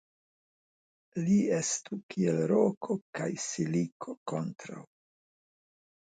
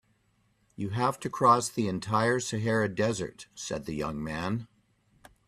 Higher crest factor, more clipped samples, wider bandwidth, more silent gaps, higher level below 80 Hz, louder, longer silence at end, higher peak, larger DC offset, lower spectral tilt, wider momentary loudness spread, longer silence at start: about the same, 20 dB vs 20 dB; neither; second, 9.4 kHz vs 14 kHz; first, 2.03-2.09 s, 2.77-2.81 s, 3.02-3.13 s, 3.92-4.00 s, 4.17-4.26 s vs none; second, -74 dBFS vs -58 dBFS; about the same, -31 LUFS vs -29 LUFS; first, 1.2 s vs 0.8 s; second, -14 dBFS vs -10 dBFS; neither; about the same, -5.5 dB/octave vs -5 dB/octave; about the same, 15 LU vs 13 LU; first, 1.15 s vs 0.8 s